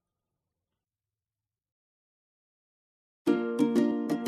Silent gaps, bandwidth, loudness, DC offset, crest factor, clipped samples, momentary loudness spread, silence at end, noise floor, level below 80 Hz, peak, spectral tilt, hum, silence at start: none; 13.5 kHz; -28 LUFS; under 0.1%; 20 dB; under 0.1%; 4 LU; 0 s; under -90 dBFS; -82 dBFS; -12 dBFS; -6.5 dB/octave; none; 3.25 s